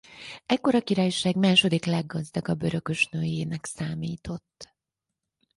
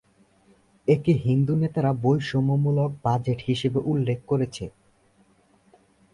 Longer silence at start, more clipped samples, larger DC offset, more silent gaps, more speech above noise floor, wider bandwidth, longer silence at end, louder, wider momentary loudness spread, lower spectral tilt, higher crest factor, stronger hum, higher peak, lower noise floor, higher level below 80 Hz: second, 0.1 s vs 0.85 s; neither; neither; neither; first, 60 dB vs 38 dB; about the same, 11.5 kHz vs 11 kHz; second, 0.95 s vs 1.45 s; about the same, -25 LUFS vs -24 LUFS; first, 16 LU vs 5 LU; second, -5 dB/octave vs -8 dB/octave; about the same, 20 dB vs 16 dB; neither; about the same, -8 dBFS vs -8 dBFS; first, -86 dBFS vs -61 dBFS; about the same, -58 dBFS vs -54 dBFS